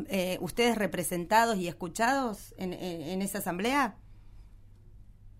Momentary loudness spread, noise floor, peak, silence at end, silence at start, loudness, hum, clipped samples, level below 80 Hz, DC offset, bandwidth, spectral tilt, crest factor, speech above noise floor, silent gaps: 11 LU; -52 dBFS; -12 dBFS; 0.1 s; 0 s; -30 LUFS; none; under 0.1%; -54 dBFS; under 0.1%; 16 kHz; -4 dB/octave; 20 dB; 22 dB; none